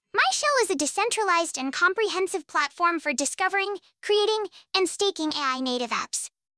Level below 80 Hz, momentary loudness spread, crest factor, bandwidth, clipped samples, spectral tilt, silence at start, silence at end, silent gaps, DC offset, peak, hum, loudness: -74 dBFS; 5 LU; 18 dB; 11 kHz; under 0.1%; 0 dB/octave; 0.15 s; 0.3 s; none; under 0.1%; -8 dBFS; none; -25 LUFS